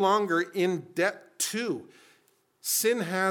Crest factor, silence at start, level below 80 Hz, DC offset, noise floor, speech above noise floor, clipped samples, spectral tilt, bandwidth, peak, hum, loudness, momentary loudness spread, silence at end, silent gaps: 18 dB; 0 s; -88 dBFS; under 0.1%; -67 dBFS; 39 dB; under 0.1%; -3 dB/octave; 18 kHz; -10 dBFS; none; -28 LUFS; 8 LU; 0 s; none